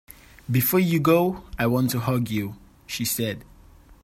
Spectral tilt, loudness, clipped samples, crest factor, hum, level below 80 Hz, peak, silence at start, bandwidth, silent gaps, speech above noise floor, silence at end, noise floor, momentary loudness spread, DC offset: -5.5 dB/octave; -23 LUFS; under 0.1%; 18 dB; none; -50 dBFS; -6 dBFS; 0.5 s; 16.5 kHz; none; 28 dB; 0.6 s; -50 dBFS; 14 LU; under 0.1%